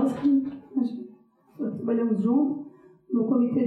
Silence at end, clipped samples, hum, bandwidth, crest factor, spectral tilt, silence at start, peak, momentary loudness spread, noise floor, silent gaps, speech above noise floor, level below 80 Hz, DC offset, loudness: 0 s; under 0.1%; none; 4.5 kHz; 14 dB; -9.5 dB/octave; 0 s; -12 dBFS; 13 LU; -54 dBFS; none; 31 dB; -72 dBFS; under 0.1%; -26 LUFS